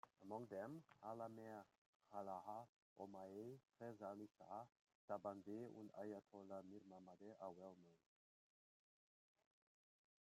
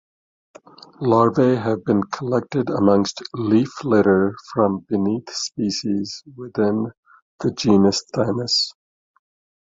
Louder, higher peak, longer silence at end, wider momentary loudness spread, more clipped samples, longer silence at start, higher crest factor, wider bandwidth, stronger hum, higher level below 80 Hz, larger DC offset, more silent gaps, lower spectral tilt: second, -57 LUFS vs -20 LUFS; second, -36 dBFS vs -2 dBFS; first, 2.25 s vs 0.95 s; about the same, 9 LU vs 10 LU; neither; second, 0.05 s vs 1 s; about the same, 22 dB vs 18 dB; first, 15.5 kHz vs 7.8 kHz; neither; second, under -90 dBFS vs -54 dBFS; neither; first, 1.78-2.00 s, 2.69-2.96 s, 4.81-4.87 s, 4.95-5.08 s vs 6.97-7.03 s, 7.22-7.39 s; first, -7.5 dB/octave vs -5.5 dB/octave